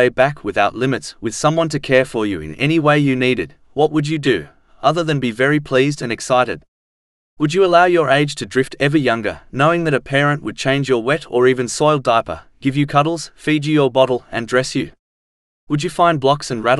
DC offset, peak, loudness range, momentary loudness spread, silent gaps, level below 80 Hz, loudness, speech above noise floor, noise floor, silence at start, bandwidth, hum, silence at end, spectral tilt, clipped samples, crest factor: under 0.1%; 0 dBFS; 2 LU; 8 LU; 6.68-7.37 s, 14.99-15.67 s; -48 dBFS; -17 LUFS; over 74 dB; under -90 dBFS; 0 s; 12 kHz; none; 0 s; -5.5 dB/octave; under 0.1%; 16 dB